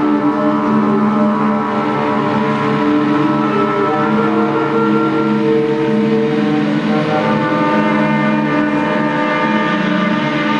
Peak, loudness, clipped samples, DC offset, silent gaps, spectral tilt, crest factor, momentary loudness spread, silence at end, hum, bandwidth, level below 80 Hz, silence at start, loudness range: -2 dBFS; -14 LUFS; under 0.1%; under 0.1%; none; -7.5 dB/octave; 12 dB; 2 LU; 0 s; none; 8.4 kHz; -52 dBFS; 0 s; 0 LU